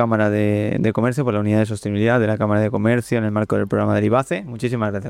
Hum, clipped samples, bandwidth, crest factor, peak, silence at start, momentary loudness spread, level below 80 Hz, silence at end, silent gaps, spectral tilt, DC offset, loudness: none; under 0.1%; 13 kHz; 14 dB; -4 dBFS; 0 s; 4 LU; -54 dBFS; 0 s; none; -7.5 dB/octave; under 0.1%; -19 LUFS